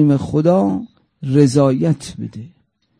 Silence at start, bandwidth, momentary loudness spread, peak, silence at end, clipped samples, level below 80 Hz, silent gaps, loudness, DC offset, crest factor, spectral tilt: 0 s; 10.5 kHz; 17 LU; -2 dBFS; 0.5 s; under 0.1%; -50 dBFS; none; -16 LUFS; under 0.1%; 16 dB; -8 dB/octave